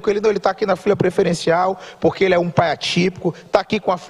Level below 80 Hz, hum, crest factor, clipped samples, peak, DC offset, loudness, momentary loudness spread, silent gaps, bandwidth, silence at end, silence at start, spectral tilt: -50 dBFS; none; 16 dB; under 0.1%; -2 dBFS; under 0.1%; -18 LUFS; 4 LU; none; 12 kHz; 0 s; 0 s; -5.5 dB/octave